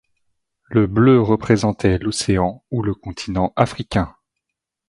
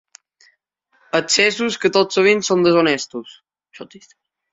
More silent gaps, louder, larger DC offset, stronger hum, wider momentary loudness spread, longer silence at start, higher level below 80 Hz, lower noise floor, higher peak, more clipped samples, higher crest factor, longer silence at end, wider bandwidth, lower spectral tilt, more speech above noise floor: neither; second, -19 LUFS vs -16 LUFS; neither; neither; second, 11 LU vs 17 LU; second, 0.7 s vs 1.15 s; first, -38 dBFS vs -64 dBFS; first, -82 dBFS vs -64 dBFS; about the same, 0 dBFS vs 0 dBFS; neither; about the same, 18 dB vs 18 dB; first, 0.8 s vs 0.65 s; first, 11.5 kHz vs 8.2 kHz; first, -6.5 dB/octave vs -3 dB/octave; first, 64 dB vs 47 dB